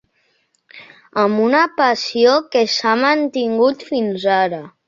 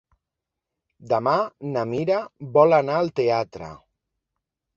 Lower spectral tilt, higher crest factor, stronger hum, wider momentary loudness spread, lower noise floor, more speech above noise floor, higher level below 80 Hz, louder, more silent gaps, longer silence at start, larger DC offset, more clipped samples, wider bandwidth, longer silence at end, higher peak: second, -4 dB/octave vs -7.5 dB/octave; about the same, 16 dB vs 20 dB; neither; second, 6 LU vs 12 LU; second, -63 dBFS vs -85 dBFS; second, 47 dB vs 63 dB; about the same, -64 dBFS vs -62 dBFS; first, -16 LUFS vs -22 LUFS; neither; second, 0.75 s vs 1 s; neither; neither; about the same, 7.4 kHz vs 7.2 kHz; second, 0.2 s vs 1 s; about the same, -2 dBFS vs -4 dBFS